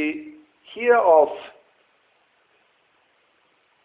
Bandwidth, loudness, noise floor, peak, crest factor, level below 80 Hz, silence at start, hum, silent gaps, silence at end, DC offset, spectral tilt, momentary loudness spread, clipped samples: 4 kHz; -18 LUFS; -64 dBFS; -4 dBFS; 20 dB; -72 dBFS; 0 s; none; none; 2.35 s; under 0.1%; -7.5 dB/octave; 28 LU; under 0.1%